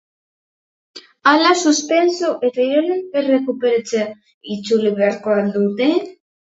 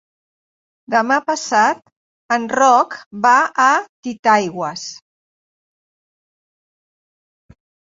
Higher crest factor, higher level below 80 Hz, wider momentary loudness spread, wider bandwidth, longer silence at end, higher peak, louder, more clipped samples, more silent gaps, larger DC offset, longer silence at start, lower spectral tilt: about the same, 18 dB vs 18 dB; about the same, -68 dBFS vs -66 dBFS; second, 9 LU vs 12 LU; about the same, 8 kHz vs 8 kHz; second, 0.4 s vs 2.95 s; about the same, 0 dBFS vs -2 dBFS; about the same, -17 LUFS vs -16 LUFS; neither; second, 4.34-4.41 s vs 1.92-2.29 s, 3.06-3.11 s, 3.89-4.03 s, 4.19-4.23 s; neither; about the same, 0.95 s vs 0.9 s; about the same, -4 dB/octave vs -3 dB/octave